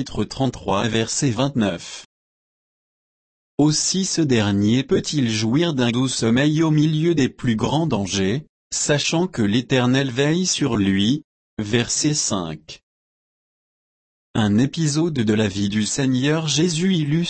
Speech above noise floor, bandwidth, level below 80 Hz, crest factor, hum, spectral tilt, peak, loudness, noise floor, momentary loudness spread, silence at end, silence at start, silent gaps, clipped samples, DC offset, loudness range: over 71 dB; 8.8 kHz; -50 dBFS; 14 dB; none; -4.5 dB/octave; -6 dBFS; -20 LUFS; under -90 dBFS; 6 LU; 0 s; 0 s; 2.05-3.58 s, 8.49-8.70 s, 11.24-11.57 s, 12.83-14.34 s; under 0.1%; under 0.1%; 5 LU